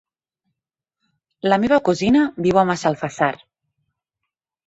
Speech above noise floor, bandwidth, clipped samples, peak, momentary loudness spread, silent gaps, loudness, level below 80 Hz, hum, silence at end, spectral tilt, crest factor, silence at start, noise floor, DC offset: 67 dB; 8.2 kHz; under 0.1%; -2 dBFS; 6 LU; none; -18 LUFS; -54 dBFS; none; 1.3 s; -6 dB/octave; 18 dB; 1.45 s; -84 dBFS; under 0.1%